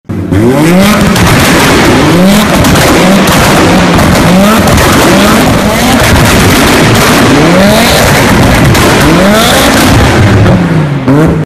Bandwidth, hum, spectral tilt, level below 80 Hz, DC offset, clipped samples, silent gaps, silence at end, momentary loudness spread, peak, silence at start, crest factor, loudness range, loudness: 16.5 kHz; none; -5 dB/octave; -18 dBFS; under 0.1%; 4%; none; 0 s; 2 LU; 0 dBFS; 0.1 s; 4 dB; 0 LU; -4 LUFS